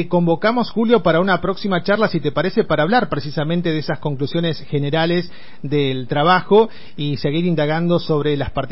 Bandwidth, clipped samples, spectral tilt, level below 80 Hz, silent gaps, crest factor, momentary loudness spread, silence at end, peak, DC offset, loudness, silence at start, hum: 5.8 kHz; under 0.1%; -11 dB/octave; -46 dBFS; none; 14 dB; 7 LU; 0.05 s; -2 dBFS; 3%; -18 LUFS; 0 s; none